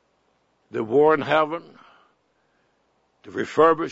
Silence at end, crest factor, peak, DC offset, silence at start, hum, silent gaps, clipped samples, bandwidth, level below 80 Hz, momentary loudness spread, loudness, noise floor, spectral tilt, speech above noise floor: 0 s; 20 dB; -4 dBFS; under 0.1%; 0.75 s; none; none; under 0.1%; 7.8 kHz; -68 dBFS; 16 LU; -21 LUFS; -67 dBFS; -6.5 dB/octave; 47 dB